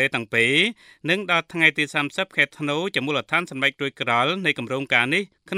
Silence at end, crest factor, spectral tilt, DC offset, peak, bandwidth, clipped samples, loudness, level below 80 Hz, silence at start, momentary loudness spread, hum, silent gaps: 0 s; 22 dB; -4 dB/octave; under 0.1%; -2 dBFS; 14.5 kHz; under 0.1%; -21 LUFS; -68 dBFS; 0 s; 6 LU; none; none